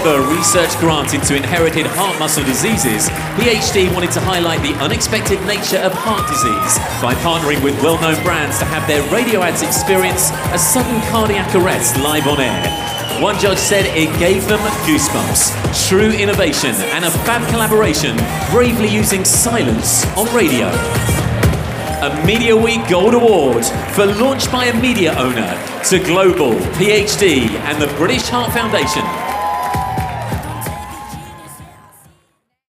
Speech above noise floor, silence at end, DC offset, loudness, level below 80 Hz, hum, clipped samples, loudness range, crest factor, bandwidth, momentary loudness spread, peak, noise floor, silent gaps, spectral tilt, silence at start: 48 dB; 1 s; under 0.1%; -14 LUFS; -32 dBFS; none; under 0.1%; 2 LU; 14 dB; 16 kHz; 6 LU; -2 dBFS; -62 dBFS; none; -3.5 dB/octave; 0 s